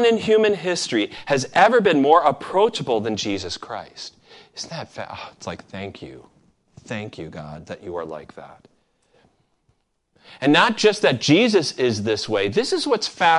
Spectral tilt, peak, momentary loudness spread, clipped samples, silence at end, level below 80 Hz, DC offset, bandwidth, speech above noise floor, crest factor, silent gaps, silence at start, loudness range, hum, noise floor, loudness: -4 dB/octave; -2 dBFS; 19 LU; under 0.1%; 0 s; -56 dBFS; under 0.1%; 11.5 kHz; 47 dB; 20 dB; none; 0 s; 17 LU; none; -67 dBFS; -19 LUFS